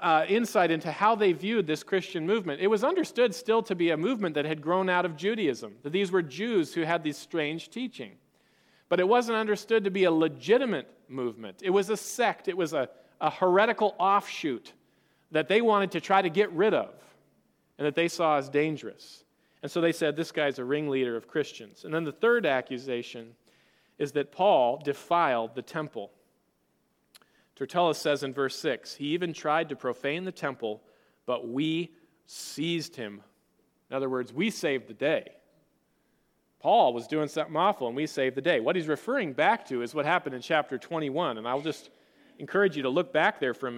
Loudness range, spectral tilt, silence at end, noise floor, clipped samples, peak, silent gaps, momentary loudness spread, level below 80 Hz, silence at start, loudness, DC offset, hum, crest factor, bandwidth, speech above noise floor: 6 LU; -5 dB/octave; 0 s; -72 dBFS; under 0.1%; -8 dBFS; none; 12 LU; -80 dBFS; 0 s; -28 LUFS; under 0.1%; none; 20 dB; 16.5 kHz; 45 dB